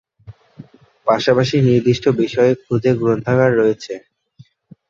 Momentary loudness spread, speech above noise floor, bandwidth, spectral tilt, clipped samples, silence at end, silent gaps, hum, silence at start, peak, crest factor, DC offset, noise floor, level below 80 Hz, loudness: 9 LU; 33 dB; 7.6 kHz; -7 dB/octave; under 0.1%; 0.9 s; none; none; 0.3 s; 0 dBFS; 16 dB; under 0.1%; -49 dBFS; -52 dBFS; -16 LUFS